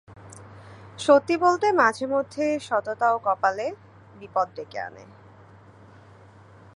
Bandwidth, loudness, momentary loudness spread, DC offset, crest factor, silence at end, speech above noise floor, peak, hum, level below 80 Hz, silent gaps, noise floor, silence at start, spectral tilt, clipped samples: 11 kHz; -23 LUFS; 25 LU; under 0.1%; 20 dB; 1.7 s; 27 dB; -4 dBFS; none; -64 dBFS; none; -50 dBFS; 0.1 s; -4.5 dB/octave; under 0.1%